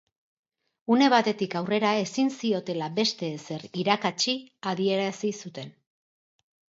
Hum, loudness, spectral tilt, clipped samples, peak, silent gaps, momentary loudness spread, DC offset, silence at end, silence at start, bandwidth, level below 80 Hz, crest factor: none; -26 LUFS; -4.5 dB/octave; under 0.1%; -6 dBFS; none; 14 LU; under 0.1%; 1.05 s; 0.9 s; 7.8 kHz; -76 dBFS; 20 dB